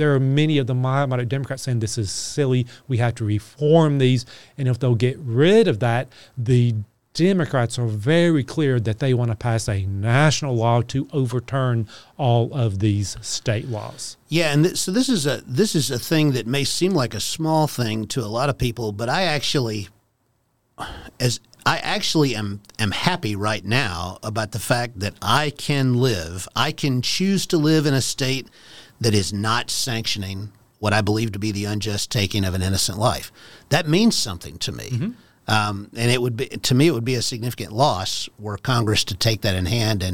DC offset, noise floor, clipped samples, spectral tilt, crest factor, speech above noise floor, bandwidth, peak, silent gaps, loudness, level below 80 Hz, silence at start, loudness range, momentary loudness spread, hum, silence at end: 0.8%; -67 dBFS; under 0.1%; -5 dB/octave; 18 dB; 46 dB; 17 kHz; -2 dBFS; none; -21 LUFS; -48 dBFS; 0 s; 3 LU; 9 LU; none; 0 s